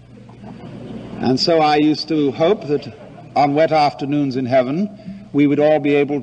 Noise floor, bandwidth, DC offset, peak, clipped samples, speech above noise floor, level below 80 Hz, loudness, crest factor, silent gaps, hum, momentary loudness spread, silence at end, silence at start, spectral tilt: -38 dBFS; 8.6 kHz; under 0.1%; -4 dBFS; under 0.1%; 22 dB; -54 dBFS; -17 LUFS; 14 dB; none; none; 19 LU; 0 s; 0.15 s; -6.5 dB/octave